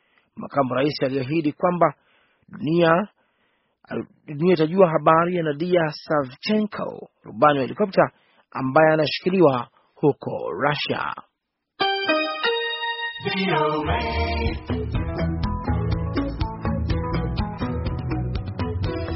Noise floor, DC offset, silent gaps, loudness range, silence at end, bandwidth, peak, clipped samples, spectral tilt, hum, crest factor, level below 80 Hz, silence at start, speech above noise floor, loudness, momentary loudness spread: -78 dBFS; under 0.1%; none; 5 LU; 0 s; 6 kHz; -2 dBFS; under 0.1%; -4.5 dB/octave; none; 20 dB; -36 dBFS; 0.35 s; 57 dB; -23 LUFS; 11 LU